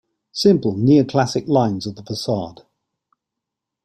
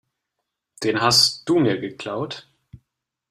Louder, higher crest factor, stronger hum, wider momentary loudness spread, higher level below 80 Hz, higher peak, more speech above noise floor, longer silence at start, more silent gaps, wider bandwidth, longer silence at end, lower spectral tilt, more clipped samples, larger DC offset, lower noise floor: about the same, -18 LUFS vs -20 LUFS; about the same, 18 dB vs 20 dB; neither; about the same, 13 LU vs 15 LU; about the same, -56 dBFS vs -60 dBFS; about the same, -2 dBFS vs -2 dBFS; first, 65 dB vs 60 dB; second, 0.35 s vs 0.8 s; neither; about the same, 15 kHz vs 15.5 kHz; first, 1.35 s vs 0.55 s; first, -6.5 dB/octave vs -3.5 dB/octave; neither; neither; about the same, -83 dBFS vs -80 dBFS